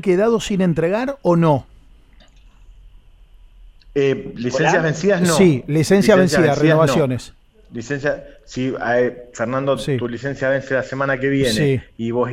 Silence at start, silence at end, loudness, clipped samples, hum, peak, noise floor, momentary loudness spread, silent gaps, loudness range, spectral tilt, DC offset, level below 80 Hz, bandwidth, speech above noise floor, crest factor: 0.05 s; 0 s; -18 LUFS; under 0.1%; none; 0 dBFS; -47 dBFS; 11 LU; none; 7 LU; -6 dB/octave; under 0.1%; -46 dBFS; 16 kHz; 30 dB; 18 dB